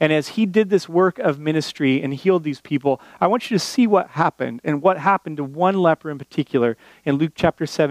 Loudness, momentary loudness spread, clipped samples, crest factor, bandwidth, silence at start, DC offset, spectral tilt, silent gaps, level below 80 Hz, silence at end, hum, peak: -20 LUFS; 6 LU; under 0.1%; 18 dB; 15 kHz; 0 s; under 0.1%; -6 dB/octave; none; -56 dBFS; 0 s; none; -2 dBFS